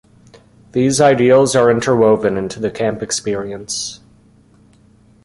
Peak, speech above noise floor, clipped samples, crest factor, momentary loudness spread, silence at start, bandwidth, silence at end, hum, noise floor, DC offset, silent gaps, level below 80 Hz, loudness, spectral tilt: -2 dBFS; 35 dB; under 0.1%; 16 dB; 12 LU; 0.75 s; 11.5 kHz; 1.3 s; none; -49 dBFS; under 0.1%; none; -50 dBFS; -15 LUFS; -4.5 dB/octave